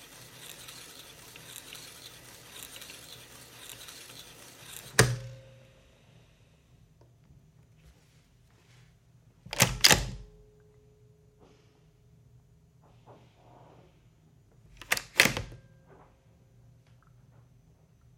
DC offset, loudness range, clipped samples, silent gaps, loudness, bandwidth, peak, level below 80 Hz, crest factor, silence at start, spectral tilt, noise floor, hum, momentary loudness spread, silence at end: under 0.1%; 17 LU; under 0.1%; none; -26 LUFS; 16.5 kHz; 0 dBFS; -54 dBFS; 36 dB; 0.4 s; -2 dB/octave; -62 dBFS; none; 25 LU; 2.6 s